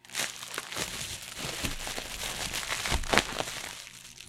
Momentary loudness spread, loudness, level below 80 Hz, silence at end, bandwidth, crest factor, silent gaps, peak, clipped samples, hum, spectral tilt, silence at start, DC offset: 11 LU; -32 LUFS; -44 dBFS; 0 s; 16.5 kHz; 32 dB; none; -2 dBFS; under 0.1%; none; -2 dB/octave; 0.05 s; under 0.1%